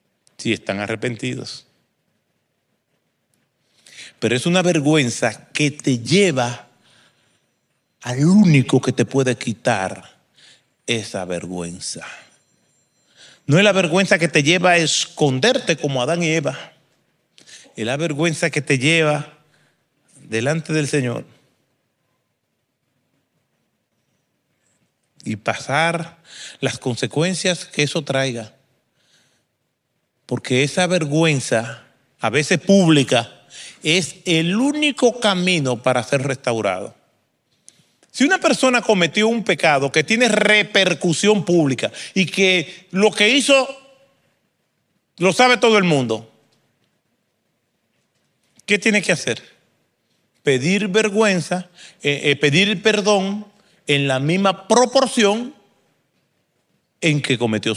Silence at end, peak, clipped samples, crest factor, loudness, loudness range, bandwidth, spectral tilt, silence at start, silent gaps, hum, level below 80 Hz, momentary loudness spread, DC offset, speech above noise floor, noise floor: 0 s; 0 dBFS; under 0.1%; 18 dB; -18 LUFS; 9 LU; 13.5 kHz; -4.5 dB/octave; 0.4 s; none; none; -66 dBFS; 14 LU; under 0.1%; 55 dB; -72 dBFS